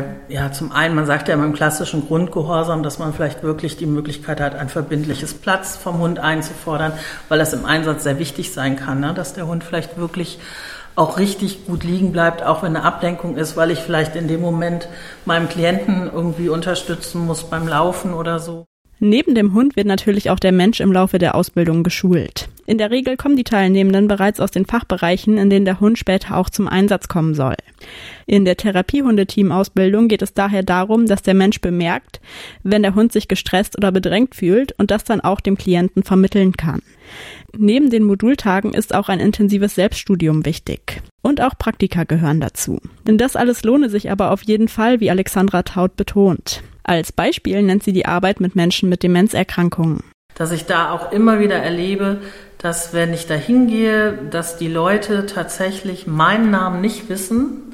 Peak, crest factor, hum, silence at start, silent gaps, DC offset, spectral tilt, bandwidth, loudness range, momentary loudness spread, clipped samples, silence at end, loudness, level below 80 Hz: 0 dBFS; 16 dB; none; 0 s; 18.66-18.85 s, 41.11-41.18 s, 50.14-50.29 s; under 0.1%; -6 dB/octave; 16 kHz; 5 LU; 10 LU; under 0.1%; 0 s; -17 LUFS; -40 dBFS